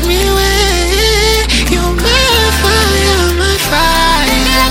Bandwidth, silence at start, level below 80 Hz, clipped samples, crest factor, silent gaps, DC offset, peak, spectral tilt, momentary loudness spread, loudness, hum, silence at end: 17 kHz; 0 s; -16 dBFS; under 0.1%; 10 dB; none; under 0.1%; 0 dBFS; -3 dB/octave; 2 LU; -10 LUFS; none; 0 s